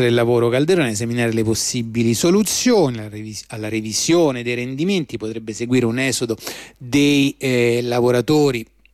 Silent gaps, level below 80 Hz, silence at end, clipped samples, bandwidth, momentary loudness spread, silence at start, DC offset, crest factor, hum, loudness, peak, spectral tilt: none; -52 dBFS; 0.3 s; under 0.1%; 15.5 kHz; 12 LU; 0 s; under 0.1%; 12 dB; none; -18 LUFS; -6 dBFS; -4.5 dB/octave